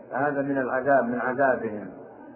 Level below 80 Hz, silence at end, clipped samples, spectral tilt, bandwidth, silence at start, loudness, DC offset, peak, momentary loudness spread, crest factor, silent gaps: -66 dBFS; 0 s; under 0.1%; -11.5 dB/octave; 3.1 kHz; 0 s; -25 LUFS; under 0.1%; -10 dBFS; 16 LU; 16 dB; none